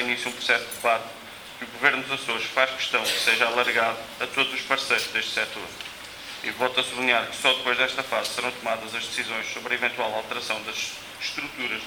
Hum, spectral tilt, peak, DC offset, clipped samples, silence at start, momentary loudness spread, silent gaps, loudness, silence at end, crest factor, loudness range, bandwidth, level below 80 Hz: none; -1 dB/octave; -4 dBFS; under 0.1%; under 0.1%; 0 s; 11 LU; none; -24 LUFS; 0 s; 22 dB; 4 LU; over 20 kHz; -64 dBFS